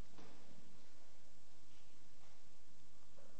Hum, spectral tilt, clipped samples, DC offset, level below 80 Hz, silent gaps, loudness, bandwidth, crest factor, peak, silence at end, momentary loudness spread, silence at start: none; -4.5 dB/octave; under 0.1%; 1%; -78 dBFS; none; -67 LUFS; 8.4 kHz; 18 dB; -36 dBFS; 0 s; 6 LU; 0 s